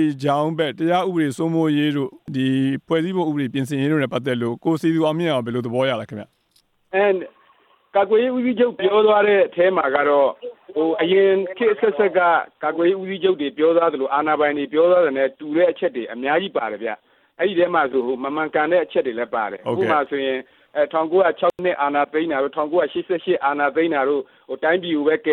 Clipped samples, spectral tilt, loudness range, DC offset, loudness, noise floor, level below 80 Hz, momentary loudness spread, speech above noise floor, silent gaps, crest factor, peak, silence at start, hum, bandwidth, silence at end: under 0.1%; -7 dB/octave; 4 LU; under 0.1%; -20 LUFS; -63 dBFS; -68 dBFS; 8 LU; 43 dB; none; 14 dB; -6 dBFS; 0 s; none; 13 kHz; 0 s